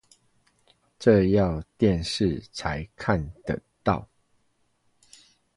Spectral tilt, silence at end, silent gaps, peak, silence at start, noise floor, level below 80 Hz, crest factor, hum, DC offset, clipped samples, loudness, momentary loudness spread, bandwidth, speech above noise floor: -6.5 dB/octave; 1.55 s; none; -6 dBFS; 1 s; -69 dBFS; -44 dBFS; 22 dB; none; under 0.1%; under 0.1%; -25 LUFS; 12 LU; 11.5 kHz; 45 dB